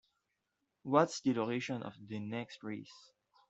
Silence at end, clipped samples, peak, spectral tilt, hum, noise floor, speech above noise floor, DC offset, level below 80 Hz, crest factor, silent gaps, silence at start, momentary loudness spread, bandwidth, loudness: 0.5 s; under 0.1%; -14 dBFS; -5.5 dB/octave; none; -85 dBFS; 49 dB; under 0.1%; -80 dBFS; 24 dB; none; 0.85 s; 16 LU; 8.2 kHz; -36 LUFS